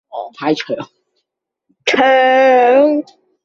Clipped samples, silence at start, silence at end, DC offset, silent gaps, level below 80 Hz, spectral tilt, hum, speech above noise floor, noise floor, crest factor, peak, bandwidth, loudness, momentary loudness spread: under 0.1%; 0.15 s; 0.4 s; under 0.1%; none; -64 dBFS; -4 dB/octave; none; 63 dB; -75 dBFS; 14 dB; -2 dBFS; 7.6 kHz; -12 LUFS; 15 LU